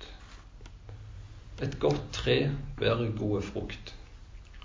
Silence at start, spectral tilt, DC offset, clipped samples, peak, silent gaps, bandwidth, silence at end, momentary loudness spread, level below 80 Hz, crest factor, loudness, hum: 0 s; -6 dB/octave; under 0.1%; under 0.1%; -14 dBFS; none; 7.6 kHz; 0 s; 23 LU; -46 dBFS; 20 dB; -31 LUFS; none